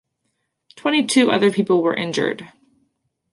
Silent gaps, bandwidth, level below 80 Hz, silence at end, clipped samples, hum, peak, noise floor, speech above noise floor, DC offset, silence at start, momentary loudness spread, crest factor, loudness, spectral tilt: none; 11.5 kHz; -66 dBFS; 0.85 s; under 0.1%; none; -2 dBFS; -73 dBFS; 55 dB; under 0.1%; 0.75 s; 9 LU; 18 dB; -18 LUFS; -4.5 dB/octave